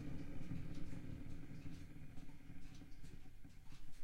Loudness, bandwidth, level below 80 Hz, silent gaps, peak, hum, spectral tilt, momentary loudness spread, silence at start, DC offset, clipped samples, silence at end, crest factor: -55 LUFS; 10 kHz; -56 dBFS; none; -32 dBFS; none; -7 dB/octave; 12 LU; 0 s; under 0.1%; under 0.1%; 0 s; 14 dB